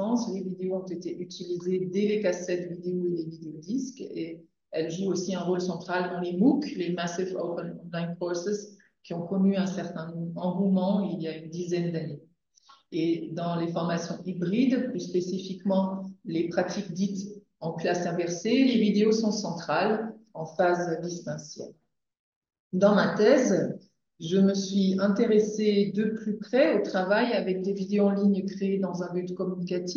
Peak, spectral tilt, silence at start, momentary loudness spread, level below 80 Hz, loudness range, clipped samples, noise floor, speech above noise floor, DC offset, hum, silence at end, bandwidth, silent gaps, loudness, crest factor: -8 dBFS; -6 dB/octave; 0 s; 13 LU; -78 dBFS; 6 LU; under 0.1%; -60 dBFS; 33 dB; under 0.1%; none; 0 s; 7.2 kHz; 22.19-22.42 s, 22.60-22.70 s; -28 LUFS; 18 dB